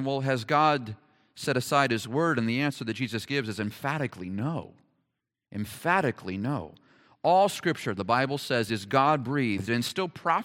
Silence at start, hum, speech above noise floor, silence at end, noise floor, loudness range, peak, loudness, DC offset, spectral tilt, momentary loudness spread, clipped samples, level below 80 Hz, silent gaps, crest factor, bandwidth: 0 s; none; 55 dB; 0 s; -82 dBFS; 6 LU; -8 dBFS; -28 LUFS; under 0.1%; -5.5 dB/octave; 10 LU; under 0.1%; -68 dBFS; none; 20 dB; 17 kHz